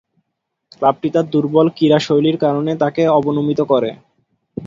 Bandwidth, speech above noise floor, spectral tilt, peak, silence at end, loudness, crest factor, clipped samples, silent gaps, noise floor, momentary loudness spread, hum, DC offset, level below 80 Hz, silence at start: 7.6 kHz; 60 dB; -7.5 dB/octave; 0 dBFS; 0 s; -16 LUFS; 16 dB; under 0.1%; none; -75 dBFS; 4 LU; none; under 0.1%; -58 dBFS; 0.8 s